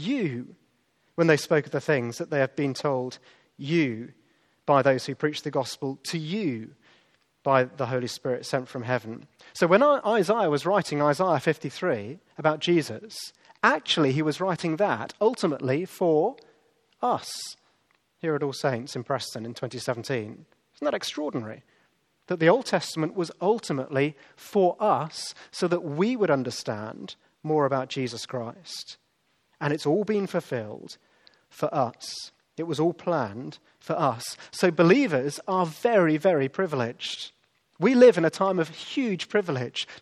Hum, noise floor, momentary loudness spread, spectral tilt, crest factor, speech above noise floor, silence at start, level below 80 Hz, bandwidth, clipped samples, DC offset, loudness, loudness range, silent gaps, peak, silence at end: none; -70 dBFS; 16 LU; -5.5 dB/octave; 22 dB; 45 dB; 0 s; -76 dBFS; 14 kHz; under 0.1%; under 0.1%; -26 LUFS; 7 LU; none; -4 dBFS; 0.05 s